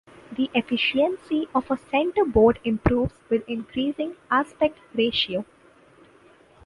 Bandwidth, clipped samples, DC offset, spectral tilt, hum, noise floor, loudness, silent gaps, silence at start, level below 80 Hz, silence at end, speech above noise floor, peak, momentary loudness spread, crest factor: 11 kHz; under 0.1%; under 0.1%; -7 dB/octave; none; -54 dBFS; -24 LUFS; none; 0.3 s; -44 dBFS; 1.2 s; 31 dB; -4 dBFS; 9 LU; 20 dB